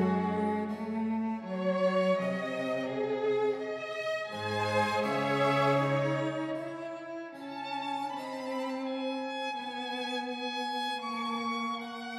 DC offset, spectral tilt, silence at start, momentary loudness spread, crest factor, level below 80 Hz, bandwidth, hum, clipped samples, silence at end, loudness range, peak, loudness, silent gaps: under 0.1%; -6 dB/octave; 0 s; 9 LU; 16 dB; -74 dBFS; 14.5 kHz; none; under 0.1%; 0 s; 6 LU; -16 dBFS; -32 LUFS; none